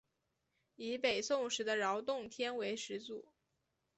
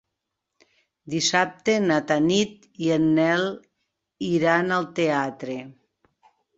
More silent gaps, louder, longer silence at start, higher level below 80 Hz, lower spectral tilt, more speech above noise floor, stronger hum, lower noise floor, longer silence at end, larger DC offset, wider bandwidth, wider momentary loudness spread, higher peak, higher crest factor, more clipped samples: neither; second, -38 LUFS vs -23 LUFS; second, 0.8 s vs 1.05 s; second, -80 dBFS vs -64 dBFS; second, -2 dB/octave vs -4.5 dB/octave; second, 46 dB vs 59 dB; neither; about the same, -85 dBFS vs -82 dBFS; about the same, 0.75 s vs 0.85 s; neither; about the same, 8.2 kHz vs 8 kHz; about the same, 11 LU vs 12 LU; second, -20 dBFS vs -4 dBFS; about the same, 20 dB vs 20 dB; neither